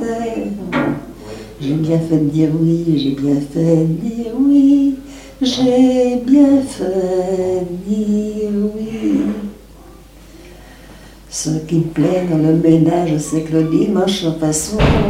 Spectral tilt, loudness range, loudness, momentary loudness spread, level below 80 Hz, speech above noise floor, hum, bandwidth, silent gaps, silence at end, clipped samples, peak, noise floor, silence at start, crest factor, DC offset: -6.5 dB/octave; 8 LU; -16 LUFS; 10 LU; -34 dBFS; 25 dB; none; 15.5 kHz; none; 0 s; under 0.1%; 0 dBFS; -39 dBFS; 0 s; 14 dB; under 0.1%